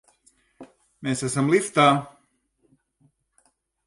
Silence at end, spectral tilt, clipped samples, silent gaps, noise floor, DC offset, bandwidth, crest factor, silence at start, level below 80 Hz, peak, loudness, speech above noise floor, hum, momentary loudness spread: 1.8 s; -5 dB/octave; under 0.1%; none; -68 dBFS; under 0.1%; 11.5 kHz; 22 dB; 0.6 s; -66 dBFS; -4 dBFS; -22 LUFS; 47 dB; none; 14 LU